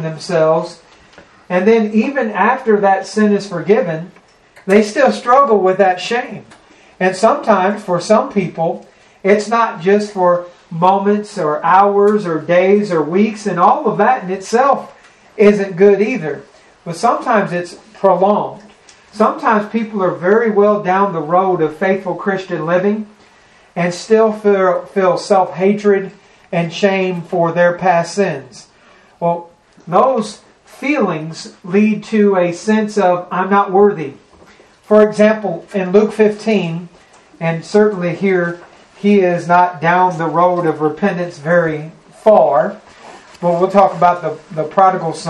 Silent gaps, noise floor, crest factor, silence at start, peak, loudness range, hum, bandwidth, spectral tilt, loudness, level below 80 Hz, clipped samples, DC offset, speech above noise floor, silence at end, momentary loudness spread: none; -47 dBFS; 14 dB; 0 s; 0 dBFS; 3 LU; none; 10.5 kHz; -6.5 dB/octave; -14 LUFS; -58 dBFS; under 0.1%; under 0.1%; 34 dB; 0 s; 10 LU